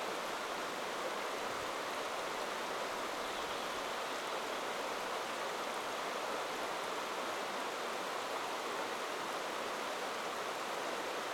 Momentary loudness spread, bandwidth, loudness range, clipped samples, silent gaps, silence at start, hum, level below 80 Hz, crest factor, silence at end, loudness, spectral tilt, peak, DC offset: 1 LU; 18 kHz; 0 LU; under 0.1%; none; 0 s; none; -74 dBFS; 14 dB; 0 s; -39 LUFS; -1.5 dB/octave; -26 dBFS; under 0.1%